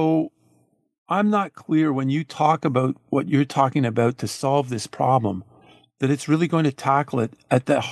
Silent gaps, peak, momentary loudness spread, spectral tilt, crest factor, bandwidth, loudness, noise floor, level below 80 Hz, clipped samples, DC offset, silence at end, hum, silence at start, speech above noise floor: 0.98-1.06 s; -4 dBFS; 6 LU; -6.5 dB/octave; 18 dB; 12.5 kHz; -22 LUFS; -63 dBFS; -66 dBFS; under 0.1%; under 0.1%; 0 s; none; 0 s; 42 dB